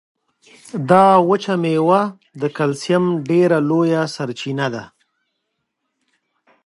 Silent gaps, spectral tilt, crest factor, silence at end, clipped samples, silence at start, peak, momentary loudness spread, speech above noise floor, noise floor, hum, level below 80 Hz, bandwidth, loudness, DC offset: none; -6.5 dB/octave; 18 dB; 1.8 s; under 0.1%; 0.75 s; 0 dBFS; 13 LU; 58 dB; -74 dBFS; none; -66 dBFS; 11.5 kHz; -17 LUFS; under 0.1%